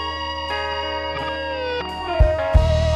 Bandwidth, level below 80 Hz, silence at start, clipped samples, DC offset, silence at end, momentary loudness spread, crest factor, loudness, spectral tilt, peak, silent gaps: 9.6 kHz; -24 dBFS; 0 s; under 0.1%; under 0.1%; 0 s; 8 LU; 16 dB; -22 LUFS; -6 dB/octave; -4 dBFS; none